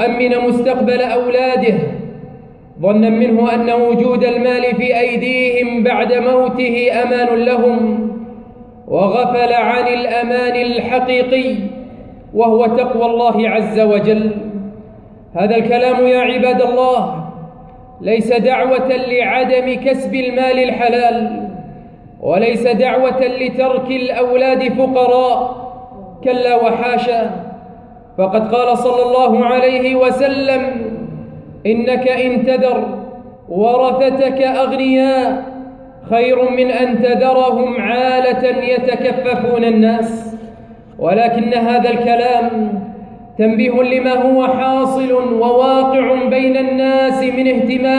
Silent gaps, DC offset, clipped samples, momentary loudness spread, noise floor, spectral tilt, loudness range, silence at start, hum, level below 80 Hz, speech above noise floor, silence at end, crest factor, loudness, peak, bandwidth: none; under 0.1%; under 0.1%; 12 LU; -37 dBFS; -7 dB/octave; 2 LU; 0 s; none; -48 dBFS; 25 dB; 0 s; 12 dB; -14 LUFS; -2 dBFS; 10 kHz